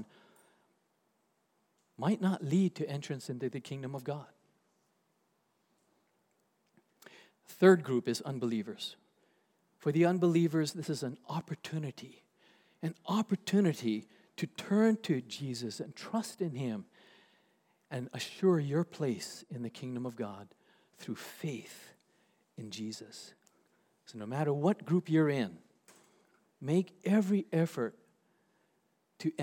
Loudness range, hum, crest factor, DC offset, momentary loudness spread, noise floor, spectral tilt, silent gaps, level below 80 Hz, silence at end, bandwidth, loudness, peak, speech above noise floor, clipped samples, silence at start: 11 LU; none; 24 dB; under 0.1%; 16 LU; -77 dBFS; -6.5 dB/octave; none; -88 dBFS; 0 s; 17.5 kHz; -34 LUFS; -12 dBFS; 44 dB; under 0.1%; 0 s